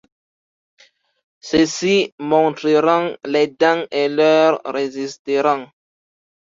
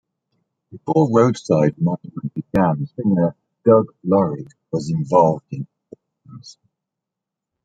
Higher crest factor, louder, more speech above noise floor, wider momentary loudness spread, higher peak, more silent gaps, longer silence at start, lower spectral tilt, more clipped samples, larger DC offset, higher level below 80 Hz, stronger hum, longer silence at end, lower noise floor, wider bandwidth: about the same, 18 dB vs 20 dB; about the same, -17 LUFS vs -19 LUFS; first, over 73 dB vs 66 dB; second, 9 LU vs 13 LU; about the same, -2 dBFS vs 0 dBFS; first, 2.12-2.18 s, 5.19-5.25 s vs none; first, 1.45 s vs 0.75 s; second, -4.5 dB/octave vs -8.5 dB/octave; neither; neither; about the same, -58 dBFS vs -56 dBFS; neither; second, 0.85 s vs 1.15 s; first, under -90 dBFS vs -84 dBFS; second, 7.8 kHz vs 9 kHz